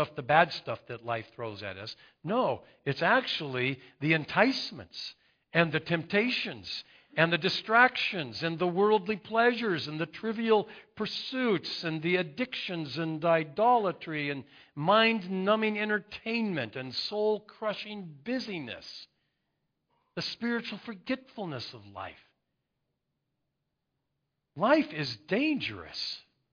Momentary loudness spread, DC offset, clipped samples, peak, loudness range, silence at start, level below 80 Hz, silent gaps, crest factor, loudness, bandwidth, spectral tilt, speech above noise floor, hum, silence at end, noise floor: 15 LU; under 0.1%; under 0.1%; -8 dBFS; 10 LU; 0 s; -72 dBFS; none; 24 dB; -29 LUFS; 5.4 kHz; -6 dB/octave; 53 dB; none; 0.35 s; -83 dBFS